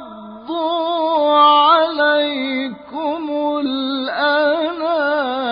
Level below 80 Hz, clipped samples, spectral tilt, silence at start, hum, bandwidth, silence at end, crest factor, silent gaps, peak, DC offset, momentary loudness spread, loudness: -62 dBFS; under 0.1%; -8 dB/octave; 0 s; none; 5.2 kHz; 0 s; 14 dB; none; -2 dBFS; under 0.1%; 12 LU; -17 LUFS